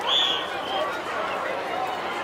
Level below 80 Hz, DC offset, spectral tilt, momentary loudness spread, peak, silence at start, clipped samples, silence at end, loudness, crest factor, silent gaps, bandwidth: -64 dBFS; under 0.1%; -2 dB/octave; 8 LU; -10 dBFS; 0 s; under 0.1%; 0 s; -26 LUFS; 16 dB; none; 16 kHz